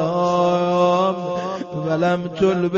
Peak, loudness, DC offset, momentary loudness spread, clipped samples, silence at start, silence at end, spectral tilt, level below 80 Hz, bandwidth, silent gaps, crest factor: -6 dBFS; -20 LUFS; under 0.1%; 8 LU; under 0.1%; 0 s; 0 s; -7 dB/octave; -56 dBFS; 7.4 kHz; none; 14 dB